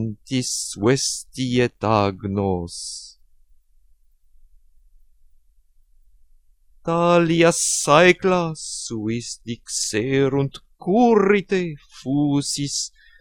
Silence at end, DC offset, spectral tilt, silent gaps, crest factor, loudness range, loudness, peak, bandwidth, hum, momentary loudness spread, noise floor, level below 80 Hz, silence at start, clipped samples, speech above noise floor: 0.35 s; under 0.1%; -4.5 dB/octave; none; 22 dB; 12 LU; -20 LUFS; 0 dBFS; 17.5 kHz; none; 15 LU; -56 dBFS; -52 dBFS; 0 s; under 0.1%; 35 dB